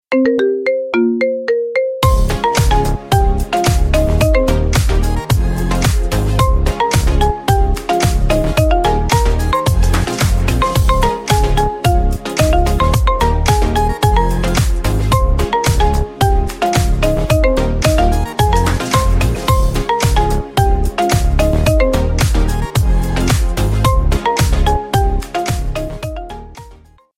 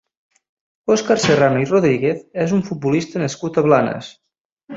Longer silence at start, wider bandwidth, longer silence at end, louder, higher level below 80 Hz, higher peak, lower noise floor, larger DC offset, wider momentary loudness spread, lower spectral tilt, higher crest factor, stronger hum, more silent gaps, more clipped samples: second, 0.1 s vs 0.85 s; first, 16.5 kHz vs 7.8 kHz; first, 0.45 s vs 0 s; about the same, -15 LUFS vs -17 LUFS; first, -16 dBFS vs -56 dBFS; about the same, 0 dBFS vs -2 dBFS; about the same, -42 dBFS vs -41 dBFS; neither; second, 3 LU vs 9 LU; about the same, -5.5 dB/octave vs -5.5 dB/octave; about the same, 12 dB vs 16 dB; neither; second, none vs 4.41-4.57 s; neither